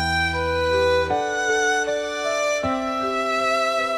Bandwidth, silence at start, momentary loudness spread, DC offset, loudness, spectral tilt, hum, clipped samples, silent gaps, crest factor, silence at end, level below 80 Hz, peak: 15 kHz; 0 s; 4 LU; under 0.1%; -21 LUFS; -3.5 dB/octave; none; under 0.1%; none; 12 dB; 0 s; -46 dBFS; -10 dBFS